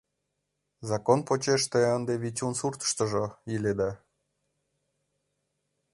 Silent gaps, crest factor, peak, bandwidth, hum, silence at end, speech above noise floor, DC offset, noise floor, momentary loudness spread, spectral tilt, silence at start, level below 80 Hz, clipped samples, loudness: none; 22 dB; -8 dBFS; 11.5 kHz; none; 2 s; 53 dB; under 0.1%; -81 dBFS; 8 LU; -4.5 dB/octave; 0.8 s; -62 dBFS; under 0.1%; -28 LUFS